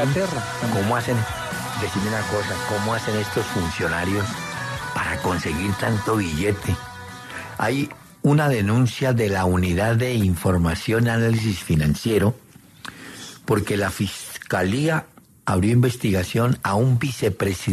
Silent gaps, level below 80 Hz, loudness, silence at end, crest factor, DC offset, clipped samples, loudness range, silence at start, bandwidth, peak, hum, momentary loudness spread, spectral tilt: none; -46 dBFS; -22 LUFS; 0 s; 16 dB; under 0.1%; under 0.1%; 4 LU; 0 s; 13.5 kHz; -6 dBFS; none; 9 LU; -6 dB/octave